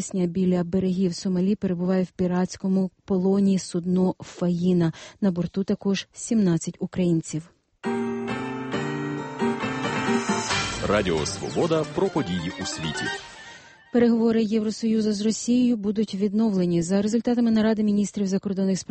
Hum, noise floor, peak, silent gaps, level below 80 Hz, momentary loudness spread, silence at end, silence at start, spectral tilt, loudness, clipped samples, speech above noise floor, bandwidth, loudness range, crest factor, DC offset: none; -46 dBFS; -8 dBFS; none; -52 dBFS; 8 LU; 0.05 s; 0 s; -6 dB/octave; -24 LUFS; under 0.1%; 23 dB; 8.8 kHz; 4 LU; 16 dB; under 0.1%